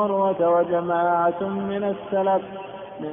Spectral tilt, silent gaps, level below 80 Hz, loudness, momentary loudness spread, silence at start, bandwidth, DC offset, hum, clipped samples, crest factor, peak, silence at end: -11.5 dB/octave; none; -62 dBFS; -22 LUFS; 15 LU; 0 s; 3.7 kHz; under 0.1%; none; under 0.1%; 12 dB; -10 dBFS; 0 s